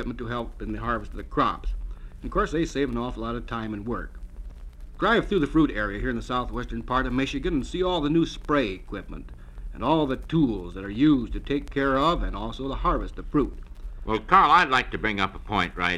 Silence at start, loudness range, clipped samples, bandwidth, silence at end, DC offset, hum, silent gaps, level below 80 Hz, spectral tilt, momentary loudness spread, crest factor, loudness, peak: 0 s; 6 LU; under 0.1%; 11 kHz; 0 s; under 0.1%; none; none; -36 dBFS; -6 dB/octave; 18 LU; 24 dB; -25 LUFS; -2 dBFS